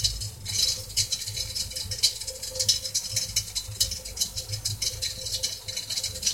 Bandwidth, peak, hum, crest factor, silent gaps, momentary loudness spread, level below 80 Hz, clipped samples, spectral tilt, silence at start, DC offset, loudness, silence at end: 17 kHz; -6 dBFS; none; 22 dB; none; 6 LU; -46 dBFS; under 0.1%; 0 dB/octave; 0 s; under 0.1%; -27 LUFS; 0 s